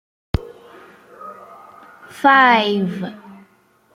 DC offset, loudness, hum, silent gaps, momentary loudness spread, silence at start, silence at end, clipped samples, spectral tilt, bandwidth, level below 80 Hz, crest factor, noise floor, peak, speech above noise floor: under 0.1%; -16 LUFS; none; none; 26 LU; 0.35 s; 0.65 s; under 0.1%; -6 dB/octave; 15.5 kHz; -40 dBFS; 20 dB; -56 dBFS; -2 dBFS; 41 dB